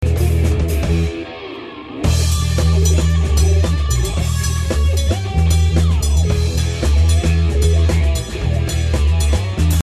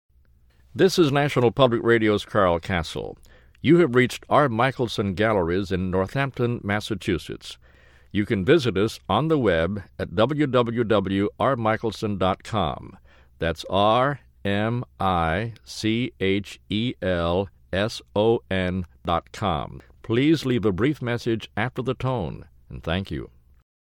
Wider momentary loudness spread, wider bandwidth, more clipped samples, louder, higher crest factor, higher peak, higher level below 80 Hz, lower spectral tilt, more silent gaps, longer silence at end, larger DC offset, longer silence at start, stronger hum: second, 5 LU vs 10 LU; second, 14 kHz vs 16.5 kHz; neither; first, -16 LUFS vs -23 LUFS; second, 12 dB vs 20 dB; about the same, -2 dBFS vs -2 dBFS; first, -18 dBFS vs -48 dBFS; about the same, -5.5 dB/octave vs -6.5 dB/octave; neither; second, 0 s vs 0.7 s; neither; second, 0 s vs 0.75 s; neither